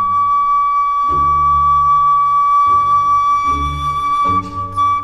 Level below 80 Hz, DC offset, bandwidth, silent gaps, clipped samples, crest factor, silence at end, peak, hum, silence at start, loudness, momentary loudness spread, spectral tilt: -34 dBFS; under 0.1%; 11 kHz; none; under 0.1%; 8 dB; 0 s; -6 dBFS; none; 0 s; -13 LUFS; 6 LU; -5 dB/octave